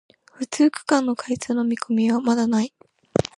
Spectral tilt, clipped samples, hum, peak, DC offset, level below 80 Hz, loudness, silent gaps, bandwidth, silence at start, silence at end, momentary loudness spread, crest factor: -5 dB/octave; under 0.1%; none; -2 dBFS; under 0.1%; -56 dBFS; -22 LUFS; none; 11.5 kHz; 0.4 s; 0.15 s; 8 LU; 20 dB